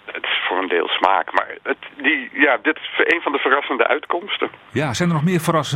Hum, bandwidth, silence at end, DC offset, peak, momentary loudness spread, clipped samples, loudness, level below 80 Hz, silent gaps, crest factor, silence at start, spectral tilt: none; 16 kHz; 0 s; under 0.1%; 0 dBFS; 7 LU; under 0.1%; -19 LUFS; -62 dBFS; none; 20 dB; 0.05 s; -5 dB/octave